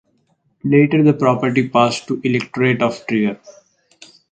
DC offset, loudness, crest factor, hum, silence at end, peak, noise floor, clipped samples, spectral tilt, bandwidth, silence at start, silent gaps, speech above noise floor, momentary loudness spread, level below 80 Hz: under 0.1%; -16 LUFS; 16 dB; none; 0.8 s; 0 dBFS; -63 dBFS; under 0.1%; -6.5 dB/octave; 9 kHz; 0.65 s; none; 47 dB; 8 LU; -60 dBFS